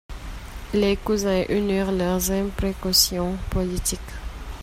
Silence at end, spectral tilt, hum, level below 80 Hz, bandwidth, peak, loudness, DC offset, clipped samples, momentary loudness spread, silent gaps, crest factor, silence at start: 0 s; -4 dB/octave; none; -34 dBFS; 16 kHz; -4 dBFS; -23 LUFS; under 0.1%; under 0.1%; 19 LU; none; 20 dB; 0.1 s